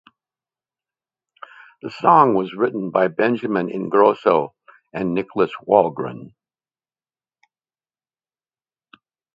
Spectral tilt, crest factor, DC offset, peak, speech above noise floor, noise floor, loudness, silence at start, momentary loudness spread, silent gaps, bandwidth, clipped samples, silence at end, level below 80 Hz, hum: -8.5 dB/octave; 22 dB; under 0.1%; 0 dBFS; over 72 dB; under -90 dBFS; -19 LUFS; 1.85 s; 17 LU; none; 7.4 kHz; under 0.1%; 3.05 s; -66 dBFS; none